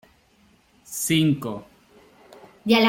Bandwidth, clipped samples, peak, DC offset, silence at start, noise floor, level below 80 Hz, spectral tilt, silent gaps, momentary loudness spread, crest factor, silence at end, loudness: 17 kHz; under 0.1%; -4 dBFS; under 0.1%; 0.9 s; -59 dBFS; -62 dBFS; -4.5 dB/octave; none; 14 LU; 20 dB; 0 s; -24 LUFS